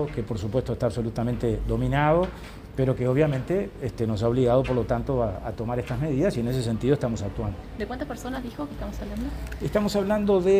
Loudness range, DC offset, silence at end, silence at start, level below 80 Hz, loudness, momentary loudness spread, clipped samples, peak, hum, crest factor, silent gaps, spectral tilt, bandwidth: 5 LU; under 0.1%; 0 s; 0 s; -38 dBFS; -26 LUFS; 11 LU; under 0.1%; -8 dBFS; none; 16 dB; none; -7.5 dB/octave; 15.5 kHz